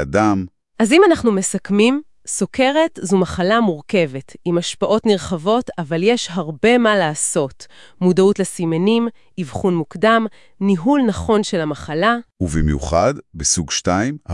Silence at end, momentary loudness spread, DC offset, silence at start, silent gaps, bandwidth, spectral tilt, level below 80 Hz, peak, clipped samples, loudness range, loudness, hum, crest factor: 0 s; 9 LU; 0.5%; 0 s; none; 12 kHz; -4.5 dB/octave; -38 dBFS; -2 dBFS; under 0.1%; 2 LU; -17 LUFS; none; 16 dB